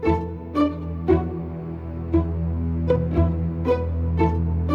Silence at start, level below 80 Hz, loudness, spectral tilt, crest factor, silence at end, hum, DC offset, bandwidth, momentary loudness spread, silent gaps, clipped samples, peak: 0 s; -30 dBFS; -24 LUFS; -10 dB/octave; 16 dB; 0 s; none; under 0.1%; 5.2 kHz; 9 LU; none; under 0.1%; -6 dBFS